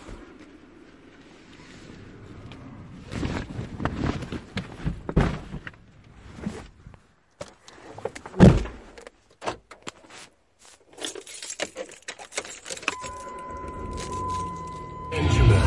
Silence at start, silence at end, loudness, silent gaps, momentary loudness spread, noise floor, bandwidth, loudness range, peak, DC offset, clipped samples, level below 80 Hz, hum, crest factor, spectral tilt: 0 s; 0 s; -28 LUFS; none; 22 LU; -55 dBFS; 11.5 kHz; 12 LU; -2 dBFS; under 0.1%; under 0.1%; -36 dBFS; none; 26 dB; -6 dB/octave